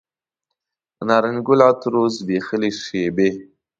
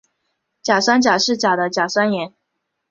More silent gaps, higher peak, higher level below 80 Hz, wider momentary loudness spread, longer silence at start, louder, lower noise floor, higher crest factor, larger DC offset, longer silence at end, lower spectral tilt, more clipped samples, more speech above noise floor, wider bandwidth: neither; about the same, 0 dBFS vs 0 dBFS; about the same, -60 dBFS vs -64 dBFS; about the same, 9 LU vs 11 LU; first, 1 s vs 0.65 s; about the same, -19 LUFS vs -17 LUFS; first, -81 dBFS vs -75 dBFS; about the same, 20 dB vs 18 dB; neither; second, 0.35 s vs 0.6 s; first, -6 dB/octave vs -3 dB/octave; neither; first, 63 dB vs 58 dB; about the same, 7.8 kHz vs 7.6 kHz